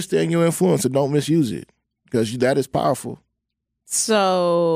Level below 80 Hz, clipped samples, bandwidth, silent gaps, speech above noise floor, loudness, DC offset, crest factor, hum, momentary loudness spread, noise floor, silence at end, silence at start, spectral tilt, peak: -58 dBFS; under 0.1%; 16 kHz; none; 60 dB; -20 LUFS; under 0.1%; 14 dB; none; 9 LU; -79 dBFS; 0 s; 0 s; -5 dB/octave; -6 dBFS